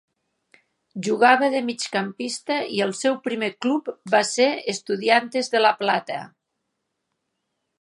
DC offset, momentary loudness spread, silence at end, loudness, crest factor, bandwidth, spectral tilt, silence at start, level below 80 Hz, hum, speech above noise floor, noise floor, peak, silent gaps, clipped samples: under 0.1%; 10 LU; 1.55 s; -22 LUFS; 22 dB; 11.5 kHz; -3 dB/octave; 0.95 s; -80 dBFS; none; 56 dB; -78 dBFS; -2 dBFS; none; under 0.1%